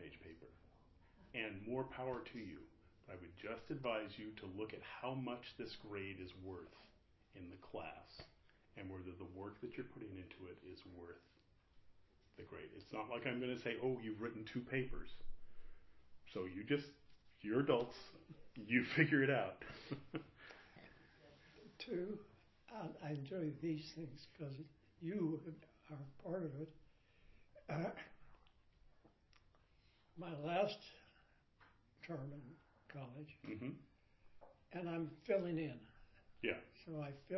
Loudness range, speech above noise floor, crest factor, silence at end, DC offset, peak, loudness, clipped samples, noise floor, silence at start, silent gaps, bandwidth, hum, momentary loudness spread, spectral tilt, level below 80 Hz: 13 LU; 28 dB; 28 dB; 0 s; under 0.1%; -18 dBFS; -45 LUFS; under 0.1%; -73 dBFS; 0 s; none; 6 kHz; none; 20 LU; -5 dB/octave; -68 dBFS